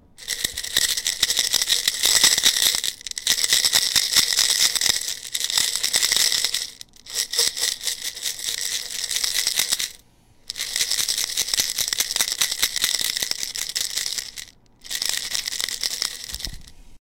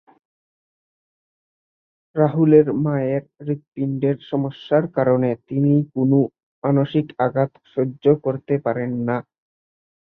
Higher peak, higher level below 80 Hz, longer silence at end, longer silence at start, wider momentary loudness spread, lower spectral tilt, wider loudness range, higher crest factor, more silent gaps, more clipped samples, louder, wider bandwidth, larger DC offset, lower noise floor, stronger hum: about the same, -2 dBFS vs -2 dBFS; first, -50 dBFS vs -64 dBFS; second, 0.1 s vs 0.9 s; second, 0.2 s vs 2.15 s; about the same, 10 LU vs 9 LU; second, 2 dB/octave vs -11.5 dB/octave; first, 7 LU vs 2 LU; about the same, 22 dB vs 18 dB; second, none vs 3.68-3.72 s, 6.43-6.62 s; neither; about the same, -20 LUFS vs -20 LUFS; first, 17 kHz vs 4.2 kHz; neither; second, -54 dBFS vs under -90 dBFS; neither